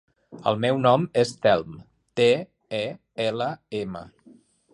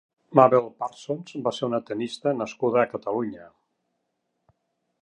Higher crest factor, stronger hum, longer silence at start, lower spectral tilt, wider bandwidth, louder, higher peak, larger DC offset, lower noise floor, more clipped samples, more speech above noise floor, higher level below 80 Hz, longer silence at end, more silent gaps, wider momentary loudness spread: about the same, 20 dB vs 24 dB; neither; about the same, 0.3 s vs 0.3 s; about the same, -5.5 dB/octave vs -6.5 dB/octave; about the same, 11.5 kHz vs 10.5 kHz; about the same, -24 LUFS vs -25 LUFS; about the same, -4 dBFS vs -2 dBFS; neither; second, -55 dBFS vs -77 dBFS; neither; second, 31 dB vs 53 dB; first, -62 dBFS vs -72 dBFS; second, 0.65 s vs 1.55 s; neither; about the same, 13 LU vs 15 LU